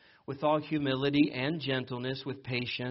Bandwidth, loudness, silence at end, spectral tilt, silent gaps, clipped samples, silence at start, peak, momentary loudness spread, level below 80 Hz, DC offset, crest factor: 5.8 kHz; -31 LUFS; 0 s; -4.5 dB/octave; none; under 0.1%; 0.3 s; -14 dBFS; 9 LU; -66 dBFS; under 0.1%; 18 dB